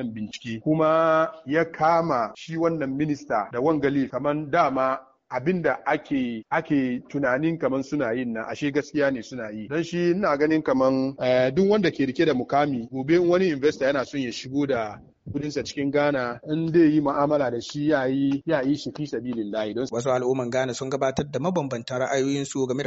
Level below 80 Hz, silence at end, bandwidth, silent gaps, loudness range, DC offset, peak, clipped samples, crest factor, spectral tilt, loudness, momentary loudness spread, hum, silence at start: -58 dBFS; 0 s; 8 kHz; none; 4 LU; under 0.1%; -8 dBFS; under 0.1%; 16 dB; -5.5 dB/octave; -24 LUFS; 9 LU; none; 0 s